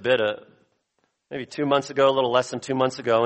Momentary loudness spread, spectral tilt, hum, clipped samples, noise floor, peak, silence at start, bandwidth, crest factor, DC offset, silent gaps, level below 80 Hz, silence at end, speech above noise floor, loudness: 15 LU; -5 dB/octave; none; under 0.1%; -73 dBFS; -6 dBFS; 0 s; 8.8 kHz; 18 dB; under 0.1%; none; -68 dBFS; 0 s; 50 dB; -23 LUFS